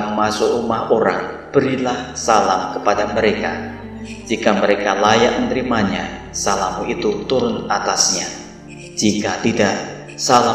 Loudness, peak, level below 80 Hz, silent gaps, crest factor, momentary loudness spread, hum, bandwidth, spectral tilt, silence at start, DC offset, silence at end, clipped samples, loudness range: -18 LUFS; 0 dBFS; -44 dBFS; none; 18 dB; 12 LU; none; 15.5 kHz; -3.5 dB/octave; 0 s; under 0.1%; 0 s; under 0.1%; 2 LU